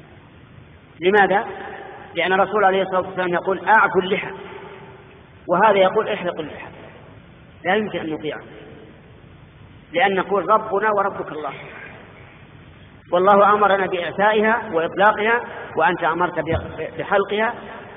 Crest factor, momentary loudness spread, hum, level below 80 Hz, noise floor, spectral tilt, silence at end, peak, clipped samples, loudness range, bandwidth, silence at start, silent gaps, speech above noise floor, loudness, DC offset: 18 dB; 20 LU; none; -52 dBFS; -45 dBFS; -3 dB/octave; 0 s; -4 dBFS; under 0.1%; 7 LU; 3.9 kHz; 0.6 s; none; 26 dB; -19 LUFS; under 0.1%